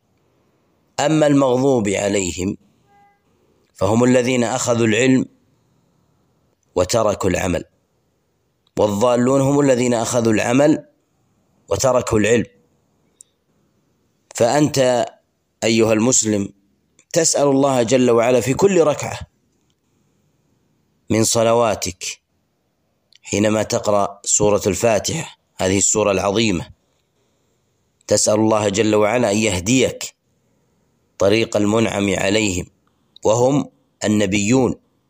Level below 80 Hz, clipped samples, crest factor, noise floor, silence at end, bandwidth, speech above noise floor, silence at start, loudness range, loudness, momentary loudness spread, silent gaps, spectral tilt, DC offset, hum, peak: -50 dBFS; under 0.1%; 16 dB; -67 dBFS; 0.35 s; 15.5 kHz; 51 dB; 1 s; 4 LU; -17 LUFS; 11 LU; none; -4.5 dB/octave; under 0.1%; none; -2 dBFS